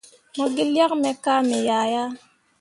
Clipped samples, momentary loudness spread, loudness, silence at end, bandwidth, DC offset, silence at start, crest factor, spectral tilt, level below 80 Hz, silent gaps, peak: under 0.1%; 12 LU; -22 LUFS; 0.45 s; 11.5 kHz; under 0.1%; 0.35 s; 16 dB; -3.5 dB/octave; -72 dBFS; none; -6 dBFS